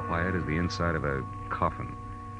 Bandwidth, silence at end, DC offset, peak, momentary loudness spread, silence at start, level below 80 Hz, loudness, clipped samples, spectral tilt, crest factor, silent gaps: 10 kHz; 0 s; under 0.1%; -12 dBFS; 10 LU; 0 s; -44 dBFS; -30 LUFS; under 0.1%; -6.5 dB/octave; 18 dB; none